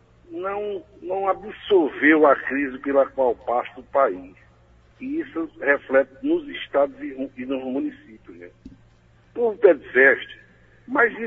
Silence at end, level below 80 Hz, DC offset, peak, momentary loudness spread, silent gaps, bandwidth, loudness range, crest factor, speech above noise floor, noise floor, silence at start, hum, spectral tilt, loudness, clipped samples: 0 s; -58 dBFS; under 0.1%; -2 dBFS; 16 LU; none; 3.9 kHz; 5 LU; 20 dB; 33 dB; -55 dBFS; 0.3 s; none; -7 dB/octave; -22 LUFS; under 0.1%